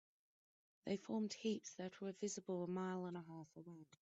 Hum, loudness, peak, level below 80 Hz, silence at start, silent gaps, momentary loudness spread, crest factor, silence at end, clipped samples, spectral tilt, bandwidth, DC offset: none; -47 LUFS; -30 dBFS; -88 dBFS; 0.85 s; none; 13 LU; 18 dB; 0.05 s; under 0.1%; -6 dB/octave; 8 kHz; under 0.1%